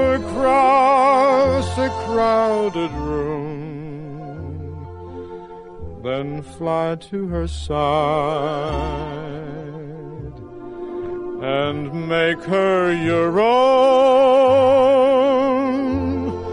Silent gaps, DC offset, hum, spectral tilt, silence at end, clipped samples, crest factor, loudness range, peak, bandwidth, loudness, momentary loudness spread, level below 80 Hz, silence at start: none; under 0.1%; none; -6.5 dB/octave; 0 s; under 0.1%; 14 dB; 13 LU; -4 dBFS; 10.5 kHz; -18 LUFS; 20 LU; -40 dBFS; 0 s